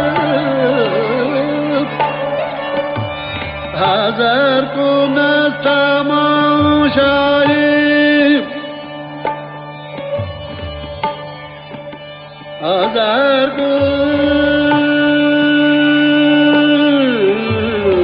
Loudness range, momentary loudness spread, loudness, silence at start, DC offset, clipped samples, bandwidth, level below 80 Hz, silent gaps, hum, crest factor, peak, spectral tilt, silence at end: 10 LU; 16 LU; -13 LUFS; 0 s; under 0.1%; under 0.1%; 5.4 kHz; -42 dBFS; none; none; 12 dB; 0 dBFS; -3 dB/octave; 0 s